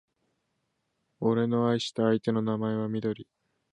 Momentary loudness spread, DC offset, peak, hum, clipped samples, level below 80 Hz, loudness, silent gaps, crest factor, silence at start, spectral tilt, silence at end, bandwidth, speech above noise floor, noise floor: 6 LU; under 0.1%; -12 dBFS; none; under 0.1%; -70 dBFS; -28 LUFS; none; 18 dB; 1.2 s; -7 dB/octave; 0.5 s; 10 kHz; 51 dB; -78 dBFS